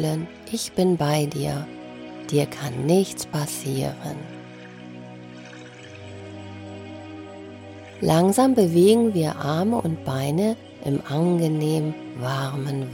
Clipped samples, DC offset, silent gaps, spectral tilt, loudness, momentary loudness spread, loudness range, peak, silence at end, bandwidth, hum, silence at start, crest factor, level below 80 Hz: under 0.1%; under 0.1%; none; -6 dB/octave; -23 LUFS; 22 LU; 18 LU; -4 dBFS; 0 s; 17 kHz; none; 0 s; 20 dB; -58 dBFS